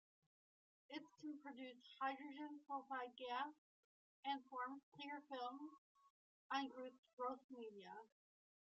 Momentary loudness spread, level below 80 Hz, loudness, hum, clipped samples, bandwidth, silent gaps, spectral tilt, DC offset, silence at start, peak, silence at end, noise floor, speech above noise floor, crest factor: 10 LU; under -90 dBFS; -52 LUFS; none; under 0.1%; 7.6 kHz; 3.58-4.23 s, 4.83-4.92 s, 5.78-5.95 s, 6.10-6.50 s, 6.98-7.03 s, 7.13-7.17 s, 7.44-7.49 s; -0.5 dB/octave; under 0.1%; 0.9 s; -32 dBFS; 0.75 s; under -90 dBFS; over 39 dB; 22 dB